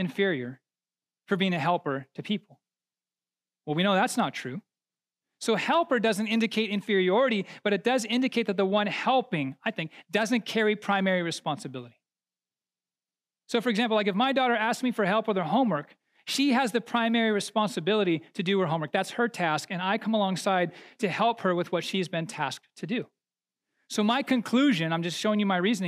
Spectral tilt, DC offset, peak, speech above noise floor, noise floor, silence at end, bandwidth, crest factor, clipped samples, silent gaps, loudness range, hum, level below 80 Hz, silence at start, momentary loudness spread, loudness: -5 dB/octave; under 0.1%; -10 dBFS; over 63 dB; under -90 dBFS; 0 s; 15 kHz; 16 dB; under 0.1%; none; 5 LU; none; -88 dBFS; 0 s; 9 LU; -27 LUFS